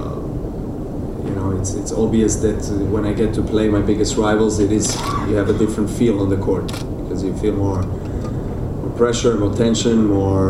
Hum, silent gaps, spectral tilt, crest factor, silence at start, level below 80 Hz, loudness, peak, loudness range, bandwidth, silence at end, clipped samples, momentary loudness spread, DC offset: none; none; -6 dB/octave; 16 dB; 0 s; -30 dBFS; -19 LUFS; -2 dBFS; 3 LU; 14 kHz; 0 s; under 0.1%; 9 LU; under 0.1%